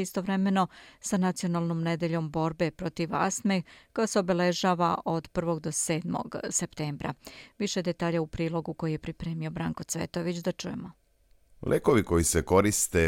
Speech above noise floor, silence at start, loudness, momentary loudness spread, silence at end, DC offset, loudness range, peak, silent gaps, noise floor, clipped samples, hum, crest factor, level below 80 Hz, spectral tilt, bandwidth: 35 dB; 0 s; -29 LUFS; 10 LU; 0 s; under 0.1%; 4 LU; -8 dBFS; none; -63 dBFS; under 0.1%; none; 20 dB; -52 dBFS; -5 dB/octave; 17 kHz